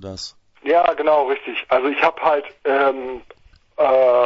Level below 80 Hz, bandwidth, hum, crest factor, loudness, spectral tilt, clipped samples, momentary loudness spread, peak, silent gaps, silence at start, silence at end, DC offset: -56 dBFS; 8 kHz; none; 18 dB; -18 LUFS; -4.5 dB/octave; under 0.1%; 16 LU; -2 dBFS; none; 0 s; 0 s; under 0.1%